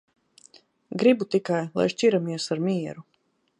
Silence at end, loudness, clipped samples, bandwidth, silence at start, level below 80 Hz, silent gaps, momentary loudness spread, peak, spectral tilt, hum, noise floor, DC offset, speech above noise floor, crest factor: 0.6 s; -24 LUFS; under 0.1%; 11 kHz; 0.9 s; -72 dBFS; none; 13 LU; -8 dBFS; -6 dB/octave; none; -56 dBFS; under 0.1%; 32 dB; 18 dB